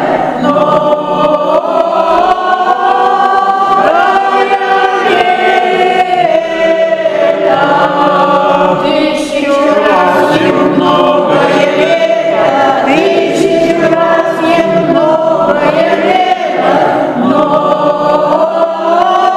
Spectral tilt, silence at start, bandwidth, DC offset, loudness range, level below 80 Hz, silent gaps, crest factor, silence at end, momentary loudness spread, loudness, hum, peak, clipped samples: -5.5 dB/octave; 0 s; 13 kHz; under 0.1%; 1 LU; -46 dBFS; none; 8 dB; 0 s; 2 LU; -9 LUFS; none; 0 dBFS; 0.4%